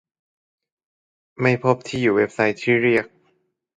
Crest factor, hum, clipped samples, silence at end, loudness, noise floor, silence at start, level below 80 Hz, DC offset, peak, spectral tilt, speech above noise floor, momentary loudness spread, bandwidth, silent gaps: 20 dB; none; under 0.1%; 0.7 s; -20 LUFS; -67 dBFS; 1.4 s; -60 dBFS; under 0.1%; -2 dBFS; -6.5 dB/octave; 48 dB; 5 LU; 9.4 kHz; none